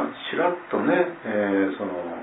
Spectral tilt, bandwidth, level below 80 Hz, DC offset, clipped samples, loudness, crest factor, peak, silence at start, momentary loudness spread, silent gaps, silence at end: -9.5 dB/octave; 4 kHz; -72 dBFS; under 0.1%; under 0.1%; -24 LUFS; 16 dB; -8 dBFS; 0 s; 6 LU; none; 0 s